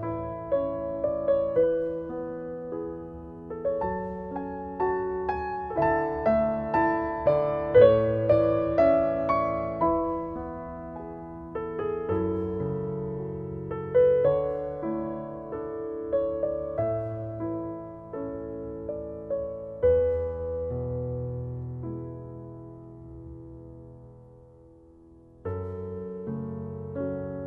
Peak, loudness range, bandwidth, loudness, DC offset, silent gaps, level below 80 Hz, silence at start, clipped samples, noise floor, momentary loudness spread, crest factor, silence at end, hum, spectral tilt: -6 dBFS; 16 LU; 5 kHz; -28 LUFS; under 0.1%; none; -48 dBFS; 0 s; under 0.1%; -53 dBFS; 17 LU; 22 dB; 0 s; none; -10.5 dB/octave